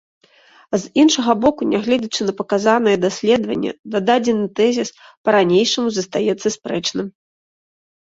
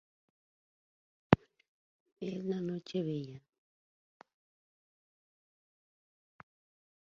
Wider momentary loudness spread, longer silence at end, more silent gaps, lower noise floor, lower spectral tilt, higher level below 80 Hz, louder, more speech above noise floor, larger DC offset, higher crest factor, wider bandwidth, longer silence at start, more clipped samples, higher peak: second, 9 LU vs 15 LU; second, 0.9 s vs 3.7 s; second, 3.79-3.84 s, 5.17-5.24 s vs 1.68-2.06 s, 2.12-2.16 s; second, -51 dBFS vs under -90 dBFS; second, -4 dB/octave vs -6.5 dB/octave; first, -58 dBFS vs -64 dBFS; first, -18 LUFS vs -35 LUFS; second, 33 dB vs over 52 dB; neither; second, 16 dB vs 38 dB; first, 8 kHz vs 7.2 kHz; second, 0.7 s vs 1.3 s; neither; about the same, -2 dBFS vs -2 dBFS